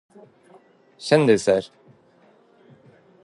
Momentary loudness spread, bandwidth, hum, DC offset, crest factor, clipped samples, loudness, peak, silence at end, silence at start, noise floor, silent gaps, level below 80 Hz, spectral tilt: 19 LU; 11.5 kHz; none; under 0.1%; 22 dB; under 0.1%; -19 LUFS; -4 dBFS; 1.55 s; 1 s; -56 dBFS; none; -64 dBFS; -5.5 dB/octave